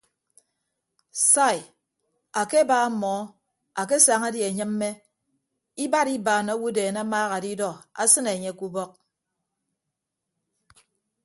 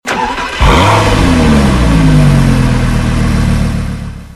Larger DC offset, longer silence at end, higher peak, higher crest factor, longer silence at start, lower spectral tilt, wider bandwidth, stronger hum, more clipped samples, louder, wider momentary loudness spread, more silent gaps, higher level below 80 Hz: neither; first, 2.35 s vs 0 s; about the same, -2 dBFS vs 0 dBFS; first, 24 dB vs 8 dB; first, 1.15 s vs 0.05 s; second, -2.5 dB/octave vs -6 dB/octave; second, 12 kHz vs 13.5 kHz; neither; second, under 0.1% vs 0.3%; second, -23 LUFS vs -10 LUFS; first, 15 LU vs 8 LU; neither; second, -74 dBFS vs -16 dBFS